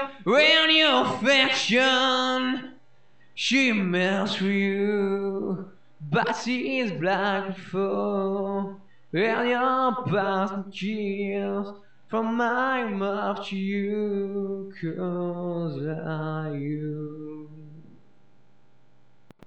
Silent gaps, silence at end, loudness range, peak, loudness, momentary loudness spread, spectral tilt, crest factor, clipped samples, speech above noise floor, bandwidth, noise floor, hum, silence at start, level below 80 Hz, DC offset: none; 0.05 s; 10 LU; -6 dBFS; -24 LUFS; 14 LU; -4.5 dB/octave; 18 dB; under 0.1%; 38 dB; 8.8 kHz; -63 dBFS; none; 0 s; -76 dBFS; 0.3%